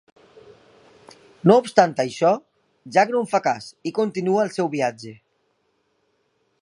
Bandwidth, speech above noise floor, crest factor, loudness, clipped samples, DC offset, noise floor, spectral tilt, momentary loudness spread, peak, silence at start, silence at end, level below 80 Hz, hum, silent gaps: 11.5 kHz; 49 dB; 22 dB; -21 LUFS; under 0.1%; under 0.1%; -69 dBFS; -6 dB/octave; 11 LU; 0 dBFS; 1.45 s; 1.45 s; -70 dBFS; none; none